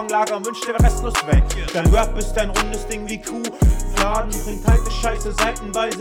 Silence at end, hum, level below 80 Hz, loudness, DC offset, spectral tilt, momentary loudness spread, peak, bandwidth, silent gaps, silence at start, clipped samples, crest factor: 0 s; none; -22 dBFS; -20 LUFS; under 0.1%; -5 dB/octave; 8 LU; -4 dBFS; 16.5 kHz; none; 0 s; under 0.1%; 14 dB